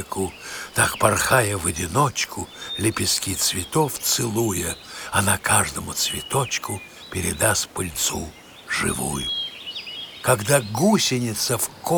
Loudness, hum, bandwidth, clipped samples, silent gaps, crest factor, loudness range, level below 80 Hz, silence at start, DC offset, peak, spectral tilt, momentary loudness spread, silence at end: -22 LUFS; none; over 20 kHz; under 0.1%; none; 24 dB; 3 LU; -46 dBFS; 0 s; under 0.1%; 0 dBFS; -3 dB/octave; 12 LU; 0 s